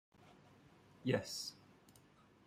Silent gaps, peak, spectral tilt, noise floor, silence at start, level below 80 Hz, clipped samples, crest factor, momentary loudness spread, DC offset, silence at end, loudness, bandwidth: none; -22 dBFS; -4.5 dB/octave; -67 dBFS; 0.2 s; -78 dBFS; under 0.1%; 24 dB; 26 LU; under 0.1%; 0.55 s; -42 LUFS; 16 kHz